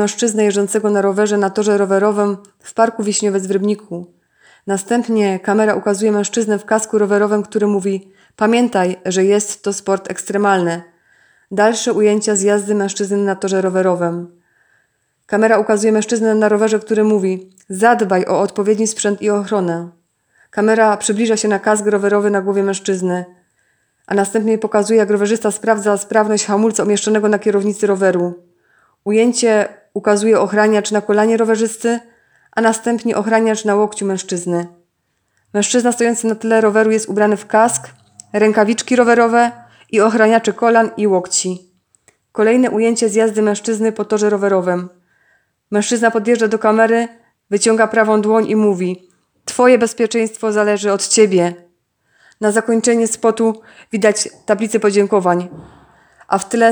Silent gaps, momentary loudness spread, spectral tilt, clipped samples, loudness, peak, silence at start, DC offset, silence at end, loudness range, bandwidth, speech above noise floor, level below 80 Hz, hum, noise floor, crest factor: none; 8 LU; -4.5 dB/octave; under 0.1%; -15 LUFS; 0 dBFS; 0 s; under 0.1%; 0 s; 3 LU; over 20 kHz; 53 dB; -68 dBFS; none; -67 dBFS; 16 dB